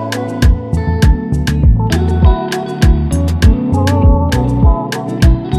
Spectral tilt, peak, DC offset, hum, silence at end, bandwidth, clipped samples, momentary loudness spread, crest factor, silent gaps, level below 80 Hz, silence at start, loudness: -7 dB/octave; 0 dBFS; under 0.1%; none; 0 s; 15 kHz; under 0.1%; 5 LU; 10 dB; none; -14 dBFS; 0 s; -13 LUFS